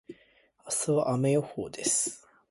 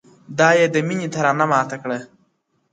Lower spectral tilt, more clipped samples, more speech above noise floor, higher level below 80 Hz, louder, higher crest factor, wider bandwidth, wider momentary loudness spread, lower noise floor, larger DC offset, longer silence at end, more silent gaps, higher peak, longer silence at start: about the same, -4.5 dB/octave vs -5 dB/octave; neither; second, 35 dB vs 48 dB; about the same, -68 dBFS vs -66 dBFS; second, -28 LUFS vs -18 LUFS; about the same, 16 dB vs 18 dB; first, 12 kHz vs 9.2 kHz; second, 8 LU vs 14 LU; about the same, -64 dBFS vs -66 dBFS; neither; second, 0.3 s vs 0.65 s; neither; second, -14 dBFS vs -2 dBFS; second, 0.1 s vs 0.3 s